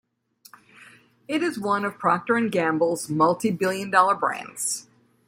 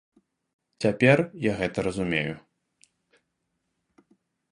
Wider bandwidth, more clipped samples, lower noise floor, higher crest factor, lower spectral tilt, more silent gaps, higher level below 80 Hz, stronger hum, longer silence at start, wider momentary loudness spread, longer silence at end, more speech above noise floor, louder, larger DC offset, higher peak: first, 16.5 kHz vs 11 kHz; neither; second, -56 dBFS vs -78 dBFS; second, 20 dB vs 26 dB; second, -4.5 dB/octave vs -6.5 dB/octave; neither; second, -70 dBFS vs -56 dBFS; neither; about the same, 0.8 s vs 0.8 s; about the same, 7 LU vs 9 LU; second, 0.45 s vs 2.15 s; second, 33 dB vs 54 dB; about the same, -23 LUFS vs -25 LUFS; neither; about the same, -4 dBFS vs -4 dBFS